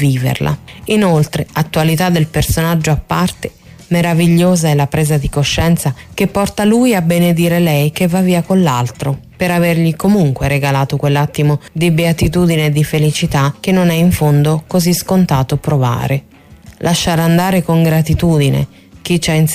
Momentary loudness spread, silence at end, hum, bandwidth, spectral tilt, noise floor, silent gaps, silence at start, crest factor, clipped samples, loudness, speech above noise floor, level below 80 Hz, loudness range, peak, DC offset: 6 LU; 0 s; none; 15.5 kHz; -6 dB/octave; -39 dBFS; none; 0 s; 10 dB; under 0.1%; -13 LUFS; 26 dB; -34 dBFS; 1 LU; -4 dBFS; under 0.1%